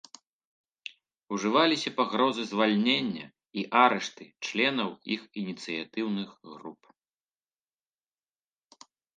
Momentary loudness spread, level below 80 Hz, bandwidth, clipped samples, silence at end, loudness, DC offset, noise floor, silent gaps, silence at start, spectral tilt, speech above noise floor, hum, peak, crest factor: 21 LU; -80 dBFS; 9.4 kHz; under 0.1%; 2.45 s; -28 LUFS; under 0.1%; under -90 dBFS; none; 1.3 s; -4.5 dB/octave; over 62 dB; none; -6 dBFS; 24 dB